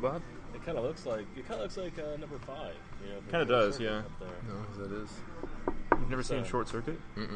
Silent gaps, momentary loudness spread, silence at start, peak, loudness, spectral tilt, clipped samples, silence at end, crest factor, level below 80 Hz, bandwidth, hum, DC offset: none; 15 LU; 0 s; -8 dBFS; -36 LUFS; -5.5 dB/octave; under 0.1%; 0 s; 26 dB; -44 dBFS; 9.8 kHz; none; under 0.1%